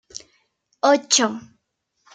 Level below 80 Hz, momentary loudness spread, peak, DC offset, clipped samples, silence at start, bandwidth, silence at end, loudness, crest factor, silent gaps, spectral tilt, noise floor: -72 dBFS; 23 LU; -2 dBFS; under 0.1%; under 0.1%; 0.15 s; 10 kHz; 0.75 s; -19 LUFS; 22 dB; none; -1 dB/octave; -73 dBFS